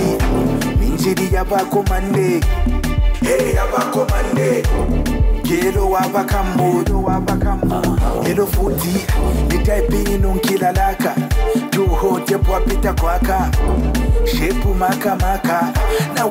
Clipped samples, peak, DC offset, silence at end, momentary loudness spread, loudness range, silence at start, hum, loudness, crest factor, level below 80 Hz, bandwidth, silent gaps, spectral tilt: under 0.1%; -6 dBFS; under 0.1%; 0 s; 2 LU; 0 LU; 0 s; none; -17 LUFS; 10 dB; -20 dBFS; 16.5 kHz; none; -6 dB/octave